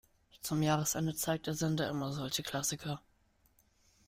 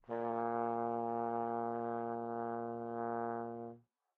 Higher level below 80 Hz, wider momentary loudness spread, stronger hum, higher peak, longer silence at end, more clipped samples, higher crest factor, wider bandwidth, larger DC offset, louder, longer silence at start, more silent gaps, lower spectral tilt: first, -64 dBFS vs -82 dBFS; first, 10 LU vs 6 LU; neither; first, -18 dBFS vs -24 dBFS; first, 1.1 s vs 0.4 s; neither; about the same, 18 dB vs 16 dB; first, 16 kHz vs 4 kHz; neither; first, -35 LUFS vs -39 LUFS; first, 0.45 s vs 0.1 s; neither; second, -4 dB/octave vs -8 dB/octave